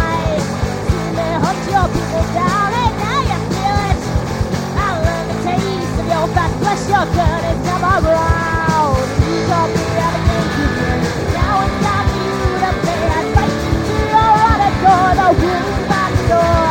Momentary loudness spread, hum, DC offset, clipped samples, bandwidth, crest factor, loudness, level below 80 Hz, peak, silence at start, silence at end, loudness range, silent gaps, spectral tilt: 6 LU; none; under 0.1%; under 0.1%; 16.5 kHz; 14 dB; -15 LUFS; -26 dBFS; 0 dBFS; 0 s; 0 s; 4 LU; none; -6 dB/octave